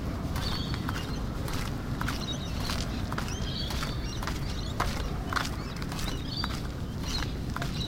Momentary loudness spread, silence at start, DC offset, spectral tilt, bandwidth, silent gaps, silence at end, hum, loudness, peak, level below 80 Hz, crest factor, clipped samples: 3 LU; 0 s; under 0.1%; -4.5 dB/octave; 16.5 kHz; none; 0 s; none; -33 LUFS; -10 dBFS; -36 dBFS; 22 dB; under 0.1%